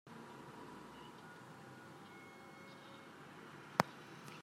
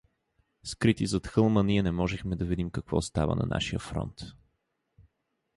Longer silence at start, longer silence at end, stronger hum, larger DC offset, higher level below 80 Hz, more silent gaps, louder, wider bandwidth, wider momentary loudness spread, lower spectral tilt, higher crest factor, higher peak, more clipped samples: second, 0.05 s vs 0.65 s; second, 0 s vs 1.25 s; neither; neither; second, -82 dBFS vs -44 dBFS; neither; second, -48 LUFS vs -29 LUFS; first, 16 kHz vs 11.5 kHz; about the same, 17 LU vs 15 LU; second, -4.5 dB/octave vs -6 dB/octave; first, 40 dB vs 20 dB; about the same, -10 dBFS vs -10 dBFS; neither